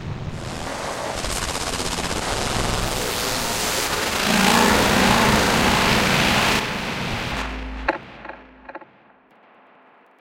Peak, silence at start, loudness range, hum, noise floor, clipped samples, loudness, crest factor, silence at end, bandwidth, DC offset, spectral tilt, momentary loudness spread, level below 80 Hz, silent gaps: -2 dBFS; 0 s; 10 LU; none; -53 dBFS; under 0.1%; -20 LUFS; 20 dB; 1.35 s; 16 kHz; under 0.1%; -3 dB/octave; 15 LU; -36 dBFS; none